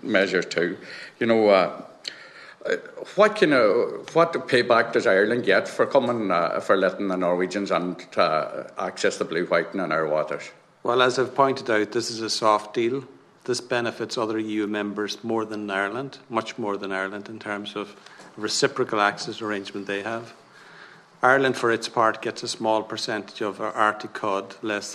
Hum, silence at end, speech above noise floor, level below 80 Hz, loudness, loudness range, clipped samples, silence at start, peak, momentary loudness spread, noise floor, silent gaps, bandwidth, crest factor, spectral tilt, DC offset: none; 0 s; 24 dB; -72 dBFS; -24 LUFS; 6 LU; under 0.1%; 0.05 s; -2 dBFS; 12 LU; -48 dBFS; none; 13 kHz; 22 dB; -4 dB/octave; under 0.1%